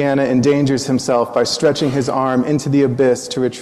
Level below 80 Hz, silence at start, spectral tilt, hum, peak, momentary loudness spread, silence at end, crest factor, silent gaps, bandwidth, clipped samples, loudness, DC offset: -50 dBFS; 0 s; -5.5 dB/octave; none; -4 dBFS; 3 LU; 0 s; 12 dB; none; 13 kHz; under 0.1%; -16 LUFS; under 0.1%